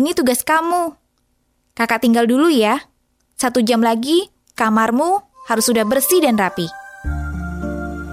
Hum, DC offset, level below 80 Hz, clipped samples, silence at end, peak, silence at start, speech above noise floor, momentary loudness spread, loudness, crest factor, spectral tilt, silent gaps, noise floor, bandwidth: none; under 0.1%; -36 dBFS; under 0.1%; 0 s; -2 dBFS; 0 s; 49 dB; 12 LU; -17 LUFS; 16 dB; -4 dB/octave; none; -64 dBFS; 16 kHz